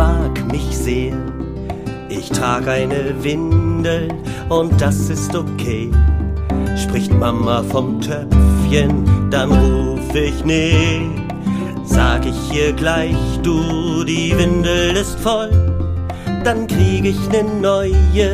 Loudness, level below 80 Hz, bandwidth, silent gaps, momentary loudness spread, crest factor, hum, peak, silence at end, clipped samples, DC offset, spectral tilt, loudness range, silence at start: -17 LUFS; -22 dBFS; 15.5 kHz; none; 8 LU; 14 dB; none; 0 dBFS; 0 s; under 0.1%; under 0.1%; -6 dB/octave; 4 LU; 0 s